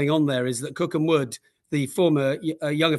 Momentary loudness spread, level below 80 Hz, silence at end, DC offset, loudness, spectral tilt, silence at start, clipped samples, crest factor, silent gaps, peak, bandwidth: 8 LU; -68 dBFS; 0 s; under 0.1%; -24 LUFS; -5.5 dB/octave; 0 s; under 0.1%; 18 dB; none; -6 dBFS; 12.5 kHz